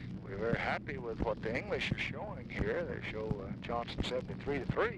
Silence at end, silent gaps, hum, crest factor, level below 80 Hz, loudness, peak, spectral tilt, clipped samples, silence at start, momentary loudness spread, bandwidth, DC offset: 0 s; none; none; 18 dB; -50 dBFS; -37 LUFS; -20 dBFS; -6.5 dB/octave; under 0.1%; 0 s; 5 LU; 11.5 kHz; under 0.1%